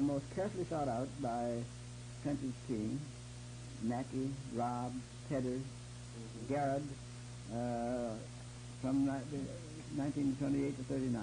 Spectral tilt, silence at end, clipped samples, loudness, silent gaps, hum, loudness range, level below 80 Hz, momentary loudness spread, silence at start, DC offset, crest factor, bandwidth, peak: -6.5 dB/octave; 0 s; under 0.1%; -40 LUFS; none; 60 Hz at -60 dBFS; 3 LU; -60 dBFS; 13 LU; 0 s; under 0.1%; 14 dB; 10.5 kHz; -26 dBFS